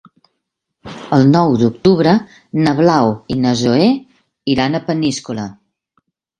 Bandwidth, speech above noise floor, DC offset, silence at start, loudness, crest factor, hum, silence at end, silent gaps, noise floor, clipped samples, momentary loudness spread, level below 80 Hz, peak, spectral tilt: 10.5 kHz; 61 dB; under 0.1%; 0.85 s; -14 LUFS; 16 dB; none; 0.9 s; none; -75 dBFS; under 0.1%; 14 LU; -48 dBFS; 0 dBFS; -6.5 dB/octave